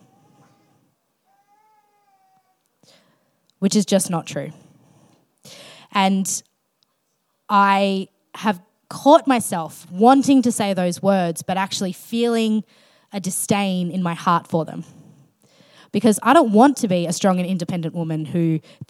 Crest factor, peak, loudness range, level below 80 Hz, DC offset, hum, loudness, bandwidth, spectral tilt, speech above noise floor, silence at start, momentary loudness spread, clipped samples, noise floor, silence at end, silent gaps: 20 dB; 0 dBFS; 8 LU; -74 dBFS; under 0.1%; none; -19 LUFS; 16 kHz; -5 dB/octave; 52 dB; 3.6 s; 14 LU; under 0.1%; -70 dBFS; 0.05 s; none